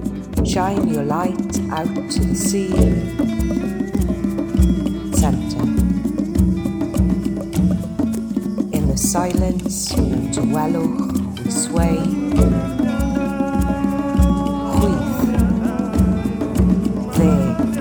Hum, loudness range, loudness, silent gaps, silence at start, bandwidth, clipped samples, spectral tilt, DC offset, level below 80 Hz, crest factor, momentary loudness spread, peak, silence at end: none; 2 LU; -19 LUFS; none; 0 s; over 20 kHz; under 0.1%; -6.5 dB/octave; under 0.1%; -26 dBFS; 16 dB; 5 LU; -2 dBFS; 0 s